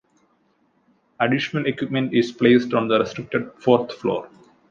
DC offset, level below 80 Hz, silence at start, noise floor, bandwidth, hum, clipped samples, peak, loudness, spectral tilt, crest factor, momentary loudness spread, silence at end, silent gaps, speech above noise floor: under 0.1%; -62 dBFS; 1.2 s; -64 dBFS; 7.4 kHz; none; under 0.1%; -2 dBFS; -21 LUFS; -6.5 dB/octave; 20 dB; 9 LU; 0.45 s; none; 44 dB